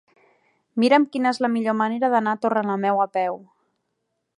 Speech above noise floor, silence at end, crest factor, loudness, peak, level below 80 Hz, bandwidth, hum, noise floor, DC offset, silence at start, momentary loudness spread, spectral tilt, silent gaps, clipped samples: 56 dB; 0.95 s; 18 dB; -21 LUFS; -6 dBFS; -78 dBFS; 11 kHz; none; -76 dBFS; under 0.1%; 0.75 s; 8 LU; -6 dB/octave; none; under 0.1%